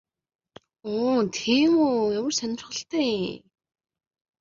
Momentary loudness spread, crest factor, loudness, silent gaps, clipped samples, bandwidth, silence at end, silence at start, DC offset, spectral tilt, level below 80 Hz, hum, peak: 12 LU; 18 dB; -24 LUFS; none; under 0.1%; 7.6 kHz; 1.05 s; 0.85 s; under 0.1%; -4 dB/octave; -66 dBFS; none; -8 dBFS